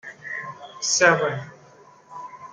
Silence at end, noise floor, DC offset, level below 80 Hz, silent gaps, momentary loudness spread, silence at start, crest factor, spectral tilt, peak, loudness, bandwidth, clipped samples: 0.05 s; -51 dBFS; under 0.1%; -70 dBFS; none; 23 LU; 0.05 s; 24 dB; -2 dB/octave; -2 dBFS; -21 LUFS; 11 kHz; under 0.1%